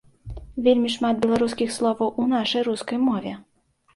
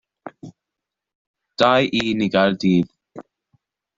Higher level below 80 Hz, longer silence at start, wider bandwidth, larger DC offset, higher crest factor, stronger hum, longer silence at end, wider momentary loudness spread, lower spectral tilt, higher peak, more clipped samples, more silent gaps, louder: first, -48 dBFS vs -58 dBFS; about the same, 0.25 s vs 0.25 s; first, 11.5 kHz vs 7.8 kHz; neither; about the same, 16 dB vs 20 dB; neither; second, 0.55 s vs 0.75 s; second, 15 LU vs 23 LU; second, -5 dB/octave vs -6.5 dB/octave; second, -6 dBFS vs -2 dBFS; neither; second, none vs 1.15-1.34 s; second, -23 LUFS vs -18 LUFS